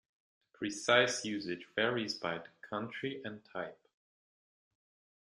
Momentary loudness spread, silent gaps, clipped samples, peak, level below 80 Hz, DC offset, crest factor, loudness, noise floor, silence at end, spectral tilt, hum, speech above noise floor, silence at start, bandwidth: 16 LU; none; under 0.1%; -12 dBFS; -80 dBFS; under 0.1%; 26 dB; -35 LUFS; under -90 dBFS; 1.55 s; -3 dB/octave; none; over 55 dB; 0.6 s; 12 kHz